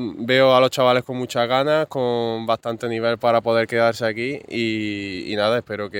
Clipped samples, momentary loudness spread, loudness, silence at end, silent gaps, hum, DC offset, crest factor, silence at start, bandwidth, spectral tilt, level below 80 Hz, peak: under 0.1%; 10 LU; -20 LUFS; 0 s; none; none; under 0.1%; 18 dB; 0 s; 17 kHz; -5.5 dB/octave; -62 dBFS; -2 dBFS